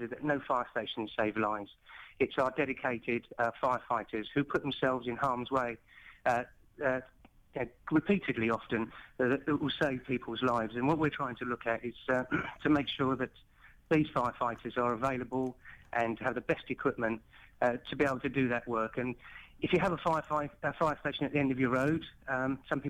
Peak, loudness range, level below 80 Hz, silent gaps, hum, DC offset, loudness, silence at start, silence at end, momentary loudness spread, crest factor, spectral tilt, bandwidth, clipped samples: -18 dBFS; 2 LU; -60 dBFS; none; none; under 0.1%; -33 LUFS; 0 s; 0 s; 7 LU; 16 dB; -7 dB/octave; 12.5 kHz; under 0.1%